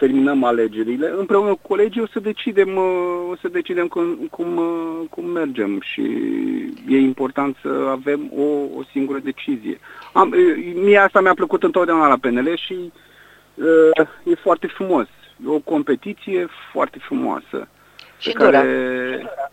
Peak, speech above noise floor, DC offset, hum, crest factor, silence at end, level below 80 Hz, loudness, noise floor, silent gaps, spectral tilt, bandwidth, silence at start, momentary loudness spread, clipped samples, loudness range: 0 dBFS; 30 dB; under 0.1%; 50 Hz at -60 dBFS; 18 dB; 0.05 s; -64 dBFS; -19 LUFS; -48 dBFS; none; -6.5 dB/octave; 14.5 kHz; 0 s; 12 LU; under 0.1%; 7 LU